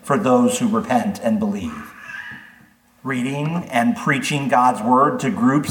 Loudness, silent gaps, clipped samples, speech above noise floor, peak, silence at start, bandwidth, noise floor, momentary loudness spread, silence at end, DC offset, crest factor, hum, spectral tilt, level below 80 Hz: -19 LUFS; none; under 0.1%; 34 dB; -2 dBFS; 0.05 s; 17.5 kHz; -52 dBFS; 17 LU; 0 s; under 0.1%; 18 dB; none; -5.5 dB/octave; -58 dBFS